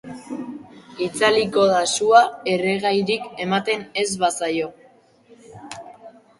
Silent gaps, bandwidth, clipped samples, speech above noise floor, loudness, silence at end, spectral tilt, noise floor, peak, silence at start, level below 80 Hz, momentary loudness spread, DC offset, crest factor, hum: none; 11.5 kHz; under 0.1%; 34 dB; -20 LUFS; 0.3 s; -3.5 dB/octave; -53 dBFS; -2 dBFS; 0.05 s; -64 dBFS; 22 LU; under 0.1%; 20 dB; none